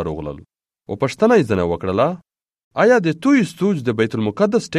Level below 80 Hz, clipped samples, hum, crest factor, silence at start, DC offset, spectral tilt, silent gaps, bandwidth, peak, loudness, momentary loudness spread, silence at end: -48 dBFS; under 0.1%; none; 16 dB; 0 s; under 0.1%; -6.5 dB/octave; 2.64-2.71 s; 12.5 kHz; -2 dBFS; -18 LUFS; 16 LU; 0 s